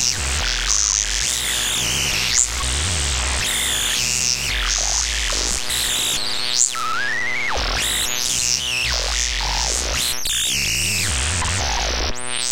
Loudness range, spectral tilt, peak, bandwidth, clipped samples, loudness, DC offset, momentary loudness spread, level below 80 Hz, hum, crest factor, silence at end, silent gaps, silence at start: 1 LU; -0.5 dB/octave; 0 dBFS; 17 kHz; under 0.1%; -18 LUFS; under 0.1%; 4 LU; -30 dBFS; none; 20 dB; 0 s; none; 0 s